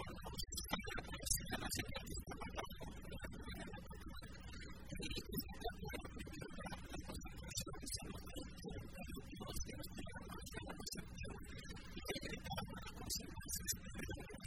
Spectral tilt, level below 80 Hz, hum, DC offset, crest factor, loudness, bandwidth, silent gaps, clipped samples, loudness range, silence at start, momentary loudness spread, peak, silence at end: -3 dB/octave; -54 dBFS; none; 0.1%; 26 dB; -48 LUFS; 16 kHz; none; under 0.1%; 5 LU; 0 s; 9 LU; -22 dBFS; 0 s